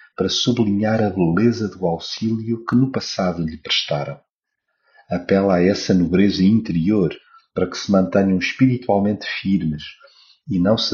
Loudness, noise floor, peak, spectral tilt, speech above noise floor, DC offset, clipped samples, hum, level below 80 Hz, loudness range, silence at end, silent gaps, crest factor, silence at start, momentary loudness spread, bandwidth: -19 LUFS; -76 dBFS; -4 dBFS; -5.5 dB/octave; 58 dB; under 0.1%; under 0.1%; none; -50 dBFS; 4 LU; 0 s; 4.30-4.41 s; 16 dB; 0.2 s; 9 LU; 7.2 kHz